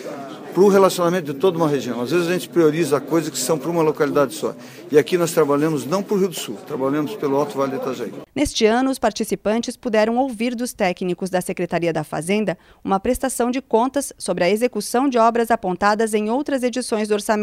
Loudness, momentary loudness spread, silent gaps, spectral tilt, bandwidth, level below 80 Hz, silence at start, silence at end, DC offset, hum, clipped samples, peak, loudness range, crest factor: -20 LUFS; 8 LU; none; -5 dB/octave; 16 kHz; -50 dBFS; 0 s; 0 s; under 0.1%; none; under 0.1%; 0 dBFS; 3 LU; 20 dB